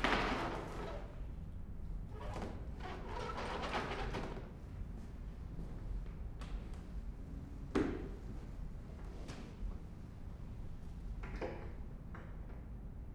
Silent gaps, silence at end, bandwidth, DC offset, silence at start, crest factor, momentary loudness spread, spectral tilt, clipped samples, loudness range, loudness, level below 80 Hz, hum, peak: none; 0 s; 12 kHz; under 0.1%; 0 s; 26 dB; 11 LU; -6 dB/octave; under 0.1%; 5 LU; -45 LUFS; -46 dBFS; none; -16 dBFS